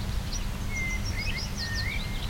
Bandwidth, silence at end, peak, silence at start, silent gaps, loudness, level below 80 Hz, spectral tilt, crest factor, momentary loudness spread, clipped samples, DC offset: 16.5 kHz; 0 s; -18 dBFS; 0 s; none; -31 LUFS; -34 dBFS; -3.5 dB/octave; 12 dB; 3 LU; under 0.1%; under 0.1%